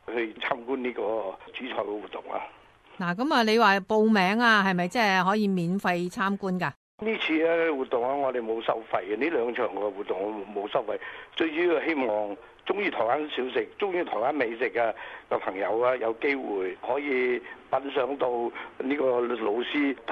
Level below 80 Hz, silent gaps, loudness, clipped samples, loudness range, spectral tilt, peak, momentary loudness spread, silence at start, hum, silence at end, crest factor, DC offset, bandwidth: -68 dBFS; 6.76-6.98 s; -27 LUFS; under 0.1%; 6 LU; -5.5 dB/octave; -8 dBFS; 11 LU; 0.1 s; none; 0 s; 18 dB; under 0.1%; 14 kHz